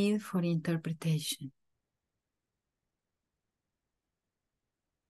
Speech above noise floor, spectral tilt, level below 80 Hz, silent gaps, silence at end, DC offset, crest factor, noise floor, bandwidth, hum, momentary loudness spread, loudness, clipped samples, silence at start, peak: 56 dB; -5.5 dB/octave; -78 dBFS; none; 3.6 s; under 0.1%; 18 dB; -88 dBFS; 12.5 kHz; none; 8 LU; -34 LUFS; under 0.1%; 0 s; -20 dBFS